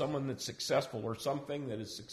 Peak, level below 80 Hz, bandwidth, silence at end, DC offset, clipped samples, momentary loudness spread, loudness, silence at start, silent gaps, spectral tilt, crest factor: -20 dBFS; -68 dBFS; 15.5 kHz; 0 s; under 0.1%; under 0.1%; 7 LU; -37 LUFS; 0 s; none; -4.5 dB/octave; 18 dB